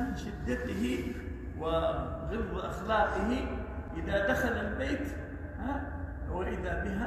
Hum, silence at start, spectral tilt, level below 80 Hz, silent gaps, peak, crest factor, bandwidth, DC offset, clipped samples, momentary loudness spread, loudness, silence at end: none; 0 s; -6.5 dB/octave; -42 dBFS; none; -16 dBFS; 18 dB; 14 kHz; under 0.1%; under 0.1%; 10 LU; -34 LUFS; 0 s